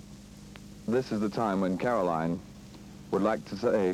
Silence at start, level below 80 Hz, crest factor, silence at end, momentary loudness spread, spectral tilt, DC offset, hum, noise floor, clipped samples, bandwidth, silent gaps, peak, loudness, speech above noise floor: 0 s; -56 dBFS; 16 dB; 0 s; 20 LU; -7 dB/octave; under 0.1%; none; -48 dBFS; under 0.1%; 14.5 kHz; none; -14 dBFS; -30 LUFS; 20 dB